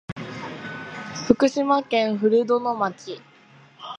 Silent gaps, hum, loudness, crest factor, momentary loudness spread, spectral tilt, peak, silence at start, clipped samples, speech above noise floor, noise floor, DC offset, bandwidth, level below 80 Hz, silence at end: 0.12-0.16 s; none; -22 LUFS; 24 dB; 17 LU; -5.5 dB/octave; 0 dBFS; 0.1 s; under 0.1%; 30 dB; -51 dBFS; under 0.1%; 9.6 kHz; -58 dBFS; 0 s